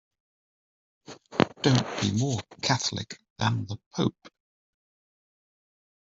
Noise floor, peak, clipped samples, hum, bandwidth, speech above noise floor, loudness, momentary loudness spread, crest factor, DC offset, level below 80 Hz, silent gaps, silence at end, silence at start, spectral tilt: under -90 dBFS; -4 dBFS; under 0.1%; none; 7.8 kHz; over 63 dB; -28 LUFS; 11 LU; 26 dB; under 0.1%; -62 dBFS; 3.30-3.36 s, 3.86-3.91 s; 1.8 s; 1.1 s; -5 dB/octave